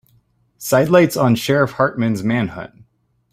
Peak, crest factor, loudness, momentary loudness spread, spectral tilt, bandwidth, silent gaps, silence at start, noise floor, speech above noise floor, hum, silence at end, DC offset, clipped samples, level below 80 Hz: -2 dBFS; 16 dB; -16 LUFS; 16 LU; -6 dB/octave; 16 kHz; none; 0.6 s; -59 dBFS; 42 dB; none; 0.65 s; under 0.1%; under 0.1%; -54 dBFS